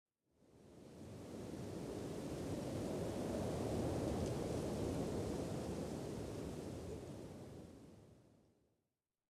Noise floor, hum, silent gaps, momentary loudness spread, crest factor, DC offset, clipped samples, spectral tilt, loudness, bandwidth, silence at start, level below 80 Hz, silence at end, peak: under -90 dBFS; none; none; 16 LU; 16 dB; under 0.1%; under 0.1%; -6.5 dB/octave; -44 LUFS; 15.5 kHz; 0.55 s; -60 dBFS; 1.15 s; -28 dBFS